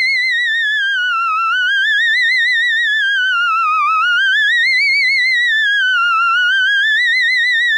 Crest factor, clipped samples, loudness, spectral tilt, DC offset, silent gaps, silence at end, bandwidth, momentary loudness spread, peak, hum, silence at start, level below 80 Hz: 6 dB; under 0.1%; -12 LUFS; 8 dB/octave; under 0.1%; none; 0 s; 15 kHz; 3 LU; -6 dBFS; none; 0 s; under -90 dBFS